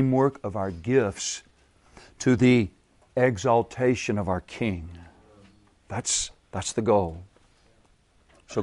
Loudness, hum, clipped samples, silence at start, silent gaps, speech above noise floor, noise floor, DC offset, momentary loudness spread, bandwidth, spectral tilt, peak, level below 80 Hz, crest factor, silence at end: -25 LUFS; none; under 0.1%; 0 s; none; 37 dB; -61 dBFS; under 0.1%; 12 LU; 11.5 kHz; -5 dB/octave; -8 dBFS; -52 dBFS; 18 dB; 0 s